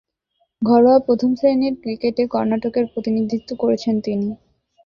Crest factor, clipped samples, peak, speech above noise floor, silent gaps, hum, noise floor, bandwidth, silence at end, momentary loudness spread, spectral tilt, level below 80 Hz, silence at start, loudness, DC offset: 16 dB; under 0.1%; -2 dBFS; 50 dB; none; none; -68 dBFS; 7 kHz; 0.5 s; 10 LU; -7.5 dB/octave; -56 dBFS; 0.6 s; -19 LUFS; under 0.1%